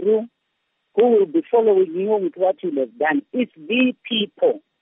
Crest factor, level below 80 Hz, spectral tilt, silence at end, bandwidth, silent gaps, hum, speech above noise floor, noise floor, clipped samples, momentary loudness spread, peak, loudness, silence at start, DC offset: 14 dB; -82 dBFS; -3 dB/octave; 0.25 s; 3.8 kHz; none; none; 54 dB; -73 dBFS; under 0.1%; 8 LU; -6 dBFS; -20 LUFS; 0 s; under 0.1%